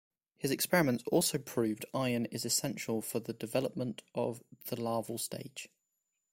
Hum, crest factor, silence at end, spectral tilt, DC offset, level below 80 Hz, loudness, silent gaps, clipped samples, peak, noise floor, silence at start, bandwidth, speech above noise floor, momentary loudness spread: none; 22 dB; 0.65 s; -4 dB/octave; under 0.1%; -70 dBFS; -34 LUFS; none; under 0.1%; -12 dBFS; -84 dBFS; 0.4 s; 16.5 kHz; 50 dB; 11 LU